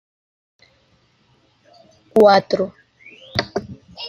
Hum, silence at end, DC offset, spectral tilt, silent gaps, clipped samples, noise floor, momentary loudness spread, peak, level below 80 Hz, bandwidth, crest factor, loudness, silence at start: none; 0 s; under 0.1%; -5.5 dB/octave; none; under 0.1%; -59 dBFS; 17 LU; -2 dBFS; -58 dBFS; 13 kHz; 20 dB; -18 LUFS; 2.15 s